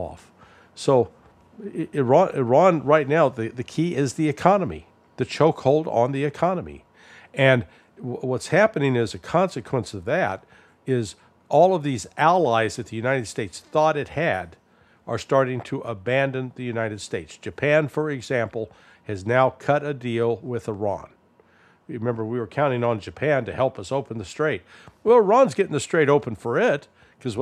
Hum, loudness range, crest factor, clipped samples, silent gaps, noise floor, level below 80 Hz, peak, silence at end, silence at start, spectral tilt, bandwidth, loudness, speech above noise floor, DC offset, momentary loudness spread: none; 5 LU; 22 dB; under 0.1%; none; -57 dBFS; -58 dBFS; 0 dBFS; 0 s; 0 s; -6 dB/octave; 13 kHz; -22 LUFS; 35 dB; under 0.1%; 14 LU